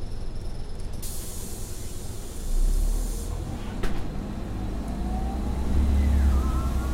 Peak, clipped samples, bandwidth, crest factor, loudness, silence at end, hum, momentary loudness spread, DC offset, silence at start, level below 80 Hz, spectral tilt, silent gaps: -10 dBFS; under 0.1%; 16 kHz; 14 dB; -30 LUFS; 0 s; none; 14 LU; under 0.1%; 0 s; -26 dBFS; -6 dB/octave; none